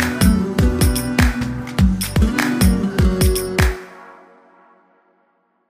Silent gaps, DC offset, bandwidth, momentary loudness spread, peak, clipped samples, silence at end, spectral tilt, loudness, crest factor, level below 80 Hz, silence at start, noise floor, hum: none; under 0.1%; 16 kHz; 5 LU; -2 dBFS; under 0.1%; 1.6 s; -5.5 dB/octave; -17 LUFS; 16 dB; -24 dBFS; 0 s; -63 dBFS; none